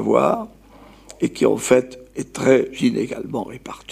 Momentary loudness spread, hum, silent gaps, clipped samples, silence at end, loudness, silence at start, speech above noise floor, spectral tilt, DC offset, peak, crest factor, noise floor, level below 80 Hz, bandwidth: 16 LU; none; none; under 0.1%; 0 s; -20 LUFS; 0 s; 27 dB; -5.5 dB/octave; under 0.1%; -2 dBFS; 18 dB; -46 dBFS; -54 dBFS; 15.5 kHz